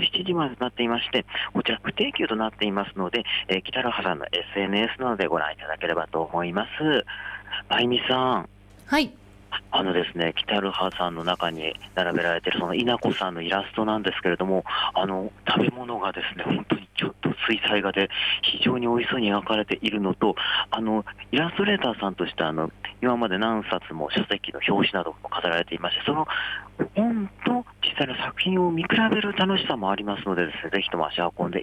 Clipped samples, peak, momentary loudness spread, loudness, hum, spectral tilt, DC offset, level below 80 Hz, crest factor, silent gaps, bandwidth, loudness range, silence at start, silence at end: under 0.1%; -10 dBFS; 6 LU; -25 LUFS; none; -6 dB/octave; under 0.1%; -54 dBFS; 16 dB; none; 13.5 kHz; 2 LU; 0 s; 0 s